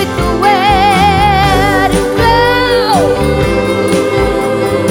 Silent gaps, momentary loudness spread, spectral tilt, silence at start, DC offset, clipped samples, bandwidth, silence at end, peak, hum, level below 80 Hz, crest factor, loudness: none; 4 LU; -5 dB/octave; 0 s; under 0.1%; under 0.1%; 17.5 kHz; 0 s; 0 dBFS; none; -24 dBFS; 10 dB; -10 LUFS